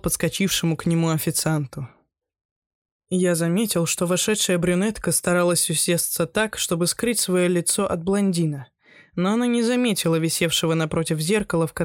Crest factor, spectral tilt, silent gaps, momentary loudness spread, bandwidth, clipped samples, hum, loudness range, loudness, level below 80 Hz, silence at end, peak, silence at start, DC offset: 14 dB; -4 dB/octave; 2.45-2.85 s, 2.91-3.00 s; 5 LU; 17.5 kHz; under 0.1%; none; 4 LU; -21 LUFS; -50 dBFS; 0 s; -8 dBFS; 0.05 s; under 0.1%